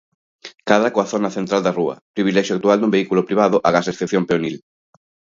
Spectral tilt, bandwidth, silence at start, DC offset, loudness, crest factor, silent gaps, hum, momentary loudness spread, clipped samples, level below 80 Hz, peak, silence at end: -5.5 dB/octave; 7.6 kHz; 0.45 s; under 0.1%; -18 LUFS; 18 dB; 2.01-2.14 s; none; 7 LU; under 0.1%; -60 dBFS; 0 dBFS; 0.75 s